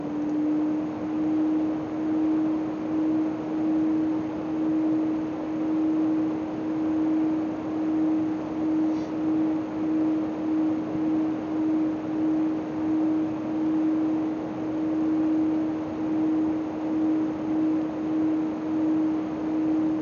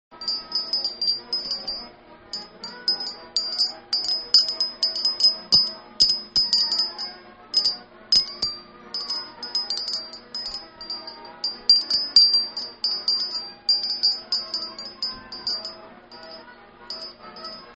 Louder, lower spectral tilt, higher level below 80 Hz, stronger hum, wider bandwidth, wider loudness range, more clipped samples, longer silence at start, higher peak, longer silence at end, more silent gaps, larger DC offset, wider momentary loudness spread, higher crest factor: second, -26 LUFS vs -21 LUFS; first, -8.5 dB/octave vs 0 dB/octave; about the same, -60 dBFS vs -58 dBFS; neither; second, 6.8 kHz vs 8.4 kHz; second, 1 LU vs 8 LU; neither; about the same, 0 s vs 0.1 s; second, -16 dBFS vs -2 dBFS; about the same, 0 s vs 0 s; neither; neither; second, 4 LU vs 18 LU; second, 10 dB vs 24 dB